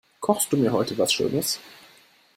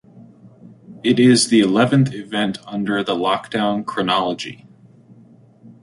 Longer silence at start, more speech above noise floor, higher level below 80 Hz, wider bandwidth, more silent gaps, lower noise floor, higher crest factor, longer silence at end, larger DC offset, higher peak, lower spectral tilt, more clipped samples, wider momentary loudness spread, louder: about the same, 0.2 s vs 0.15 s; about the same, 32 dB vs 30 dB; about the same, -62 dBFS vs -60 dBFS; first, 16 kHz vs 11.5 kHz; neither; first, -56 dBFS vs -48 dBFS; about the same, 20 dB vs 16 dB; second, 0.65 s vs 1.3 s; neither; second, -6 dBFS vs -2 dBFS; about the same, -4 dB/octave vs -5 dB/octave; neither; second, 5 LU vs 11 LU; second, -23 LUFS vs -18 LUFS